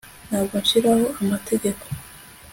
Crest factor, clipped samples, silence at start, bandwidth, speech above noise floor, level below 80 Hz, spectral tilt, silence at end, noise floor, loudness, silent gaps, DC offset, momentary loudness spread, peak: 16 dB; under 0.1%; 0.05 s; 17 kHz; 23 dB; -50 dBFS; -4.5 dB/octave; 0 s; -44 dBFS; -21 LUFS; none; under 0.1%; 17 LU; -6 dBFS